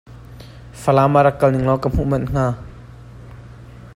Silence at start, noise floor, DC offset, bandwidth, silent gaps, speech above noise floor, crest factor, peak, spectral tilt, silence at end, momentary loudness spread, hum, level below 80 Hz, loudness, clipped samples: 0.1 s; -39 dBFS; under 0.1%; 14.5 kHz; none; 23 dB; 18 dB; -2 dBFS; -8 dB/octave; 0.05 s; 25 LU; none; -36 dBFS; -17 LUFS; under 0.1%